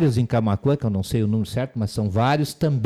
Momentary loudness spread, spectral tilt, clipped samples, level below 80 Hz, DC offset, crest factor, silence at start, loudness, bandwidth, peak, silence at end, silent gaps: 5 LU; -7 dB/octave; under 0.1%; -46 dBFS; under 0.1%; 10 dB; 0 s; -22 LUFS; 15 kHz; -12 dBFS; 0 s; none